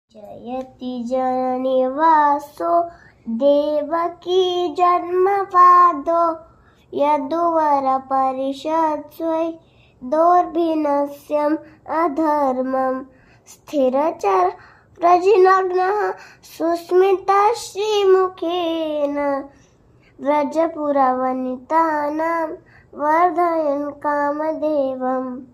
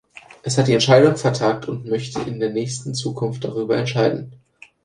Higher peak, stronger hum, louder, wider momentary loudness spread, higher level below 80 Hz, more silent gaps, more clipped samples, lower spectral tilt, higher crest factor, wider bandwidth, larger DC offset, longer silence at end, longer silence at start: about the same, -2 dBFS vs 0 dBFS; neither; about the same, -18 LUFS vs -20 LUFS; about the same, 11 LU vs 13 LU; about the same, -60 dBFS vs -56 dBFS; neither; neither; about the same, -4.5 dB/octave vs -5.5 dB/octave; about the same, 16 dB vs 20 dB; first, 15 kHz vs 11 kHz; neither; second, 0.1 s vs 0.5 s; about the same, 0.15 s vs 0.15 s